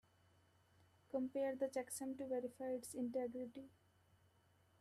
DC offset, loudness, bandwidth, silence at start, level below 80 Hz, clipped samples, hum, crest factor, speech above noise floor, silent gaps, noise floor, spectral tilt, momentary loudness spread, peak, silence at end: under 0.1%; -45 LUFS; 14 kHz; 1.1 s; -86 dBFS; under 0.1%; none; 16 dB; 30 dB; none; -75 dBFS; -4.5 dB/octave; 9 LU; -30 dBFS; 1.1 s